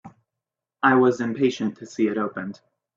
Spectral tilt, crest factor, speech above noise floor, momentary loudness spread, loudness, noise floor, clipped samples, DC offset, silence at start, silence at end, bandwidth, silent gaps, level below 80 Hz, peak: -6 dB/octave; 20 dB; 64 dB; 12 LU; -22 LUFS; -86 dBFS; under 0.1%; under 0.1%; 0.05 s; 0.45 s; 7.6 kHz; none; -70 dBFS; -4 dBFS